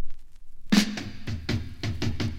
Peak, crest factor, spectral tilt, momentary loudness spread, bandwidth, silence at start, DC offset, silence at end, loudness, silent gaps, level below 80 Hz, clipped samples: -8 dBFS; 20 dB; -5 dB/octave; 12 LU; 16 kHz; 0 s; under 0.1%; 0 s; -28 LUFS; none; -40 dBFS; under 0.1%